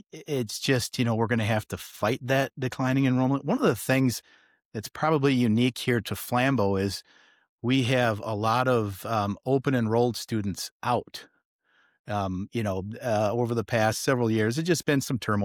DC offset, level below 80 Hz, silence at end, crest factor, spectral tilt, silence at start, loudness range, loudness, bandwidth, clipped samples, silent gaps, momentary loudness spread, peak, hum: under 0.1%; -62 dBFS; 0 s; 16 dB; -5.5 dB/octave; 0.15 s; 4 LU; -26 LUFS; 18 kHz; under 0.1%; 4.65-4.71 s, 7.49-7.58 s, 10.71-10.80 s, 11.45-11.59 s, 11.99-12.04 s; 8 LU; -10 dBFS; none